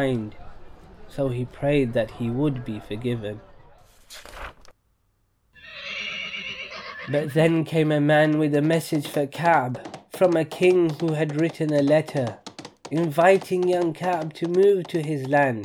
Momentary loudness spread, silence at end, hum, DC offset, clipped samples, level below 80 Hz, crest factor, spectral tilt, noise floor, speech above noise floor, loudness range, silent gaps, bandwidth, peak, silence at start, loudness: 19 LU; 0 s; none; under 0.1%; under 0.1%; -52 dBFS; 18 dB; -6.5 dB/octave; -68 dBFS; 46 dB; 13 LU; none; 18 kHz; -4 dBFS; 0 s; -23 LUFS